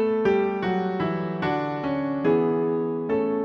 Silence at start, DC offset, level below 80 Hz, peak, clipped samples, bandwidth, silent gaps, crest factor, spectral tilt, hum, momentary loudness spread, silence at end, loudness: 0 s; under 0.1%; -56 dBFS; -10 dBFS; under 0.1%; 6.2 kHz; none; 14 dB; -8.5 dB/octave; none; 5 LU; 0 s; -25 LUFS